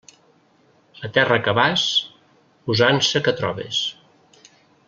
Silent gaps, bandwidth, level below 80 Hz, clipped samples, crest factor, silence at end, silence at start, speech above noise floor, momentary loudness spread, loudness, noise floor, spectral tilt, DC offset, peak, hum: none; 7.6 kHz; -60 dBFS; under 0.1%; 22 dB; 0.95 s; 1 s; 38 dB; 12 LU; -19 LUFS; -58 dBFS; -3.5 dB/octave; under 0.1%; -2 dBFS; none